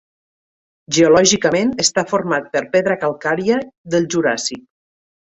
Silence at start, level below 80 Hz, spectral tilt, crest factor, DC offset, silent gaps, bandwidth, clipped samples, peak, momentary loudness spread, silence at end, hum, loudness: 0.9 s; -56 dBFS; -3.5 dB/octave; 16 dB; under 0.1%; 3.78-3.84 s; 8.4 kHz; under 0.1%; 0 dBFS; 9 LU; 0.65 s; none; -16 LUFS